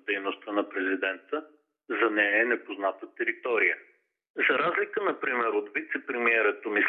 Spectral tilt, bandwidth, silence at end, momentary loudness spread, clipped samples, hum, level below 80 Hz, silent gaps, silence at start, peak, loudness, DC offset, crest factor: -6 dB/octave; 4.2 kHz; 0 s; 9 LU; under 0.1%; none; under -90 dBFS; 4.30-4.34 s; 0.05 s; -12 dBFS; -27 LUFS; under 0.1%; 18 dB